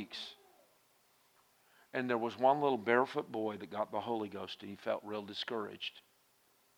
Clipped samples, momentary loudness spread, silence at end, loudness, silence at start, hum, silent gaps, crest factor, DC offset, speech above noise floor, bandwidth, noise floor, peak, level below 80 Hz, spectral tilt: under 0.1%; 13 LU; 0.75 s; -36 LUFS; 0 s; none; none; 24 dB; under 0.1%; 35 dB; over 20 kHz; -71 dBFS; -14 dBFS; -88 dBFS; -5.5 dB/octave